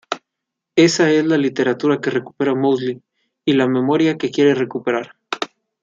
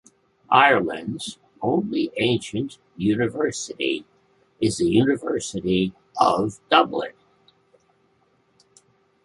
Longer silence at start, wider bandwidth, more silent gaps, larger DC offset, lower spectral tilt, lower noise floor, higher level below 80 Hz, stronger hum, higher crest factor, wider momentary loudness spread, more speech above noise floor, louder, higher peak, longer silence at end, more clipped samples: second, 0.1 s vs 0.5 s; second, 7.8 kHz vs 11.5 kHz; neither; neither; about the same, -5 dB/octave vs -5 dB/octave; first, -81 dBFS vs -64 dBFS; second, -66 dBFS vs -56 dBFS; neither; second, 16 dB vs 22 dB; about the same, 12 LU vs 12 LU; first, 65 dB vs 42 dB; first, -18 LUFS vs -22 LUFS; about the same, -2 dBFS vs -2 dBFS; second, 0.35 s vs 2.15 s; neither